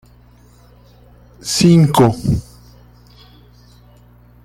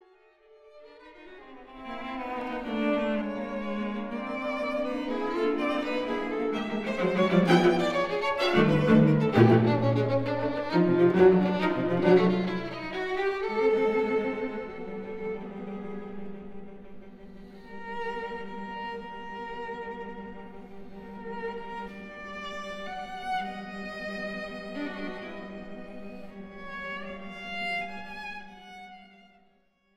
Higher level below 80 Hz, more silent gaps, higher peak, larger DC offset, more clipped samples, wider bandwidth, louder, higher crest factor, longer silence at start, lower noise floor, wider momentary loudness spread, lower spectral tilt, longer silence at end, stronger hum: first, -40 dBFS vs -56 dBFS; neither; first, -2 dBFS vs -6 dBFS; neither; neither; first, 15.5 kHz vs 11 kHz; first, -13 LUFS vs -28 LUFS; about the same, 18 dB vs 22 dB; first, 1.45 s vs 0.65 s; second, -46 dBFS vs -67 dBFS; second, 12 LU vs 22 LU; second, -6 dB/octave vs -7.5 dB/octave; first, 2.05 s vs 0.9 s; first, 60 Hz at -40 dBFS vs none